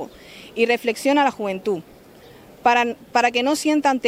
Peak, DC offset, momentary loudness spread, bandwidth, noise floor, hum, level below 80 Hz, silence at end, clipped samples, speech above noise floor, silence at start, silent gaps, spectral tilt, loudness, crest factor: -4 dBFS; under 0.1%; 11 LU; 16 kHz; -46 dBFS; none; -60 dBFS; 0 s; under 0.1%; 26 dB; 0 s; none; -3.5 dB/octave; -20 LUFS; 18 dB